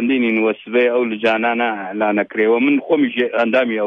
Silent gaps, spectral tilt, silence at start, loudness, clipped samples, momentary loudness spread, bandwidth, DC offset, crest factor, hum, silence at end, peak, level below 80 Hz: none; -7 dB/octave; 0 s; -17 LUFS; under 0.1%; 3 LU; 6.6 kHz; under 0.1%; 14 dB; none; 0 s; -4 dBFS; -70 dBFS